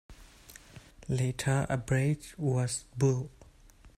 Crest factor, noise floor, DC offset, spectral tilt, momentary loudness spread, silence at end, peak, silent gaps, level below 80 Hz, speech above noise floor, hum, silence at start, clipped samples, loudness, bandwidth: 16 dB; -56 dBFS; under 0.1%; -6 dB/octave; 21 LU; 0.1 s; -16 dBFS; none; -54 dBFS; 27 dB; none; 0.1 s; under 0.1%; -31 LUFS; 14 kHz